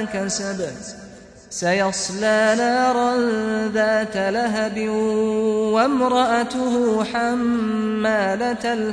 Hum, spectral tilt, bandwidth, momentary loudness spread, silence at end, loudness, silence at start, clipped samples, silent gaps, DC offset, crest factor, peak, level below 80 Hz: none; -4 dB/octave; 10.5 kHz; 6 LU; 0 s; -20 LUFS; 0 s; under 0.1%; none; under 0.1%; 14 dB; -6 dBFS; -54 dBFS